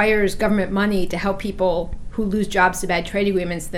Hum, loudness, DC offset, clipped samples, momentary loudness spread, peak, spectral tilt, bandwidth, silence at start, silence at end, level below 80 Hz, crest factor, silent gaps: none; -21 LUFS; under 0.1%; under 0.1%; 6 LU; -2 dBFS; -5 dB/octave; 16 kHz; 0 s; 0 s; -34 dBFS; 18 dB; none